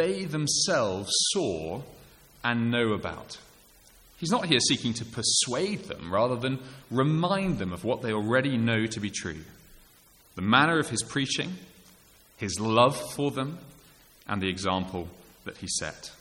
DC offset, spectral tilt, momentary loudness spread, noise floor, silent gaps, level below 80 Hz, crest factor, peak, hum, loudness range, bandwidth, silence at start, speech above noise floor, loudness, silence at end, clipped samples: under 0.1%; -3.5 dB/octave; 16 LU; -58 dBFS; none; -58 dBFS; 24 dB; -4 dBFS; none; 3 LU; 16.5 kHz; 0 s; 30 dB; -27 LUFS; 0.05 s; under 0.1%